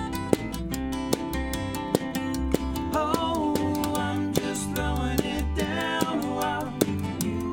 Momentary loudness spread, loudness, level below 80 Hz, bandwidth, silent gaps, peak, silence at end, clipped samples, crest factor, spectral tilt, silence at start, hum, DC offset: 4 LU; -28 LUFS; -38 dBFS; over 20 kHz; none; -4 dBFS; 0 s; under 0.1%; 24 dB; -5 dB/octave; 0 s; none; under 0.1%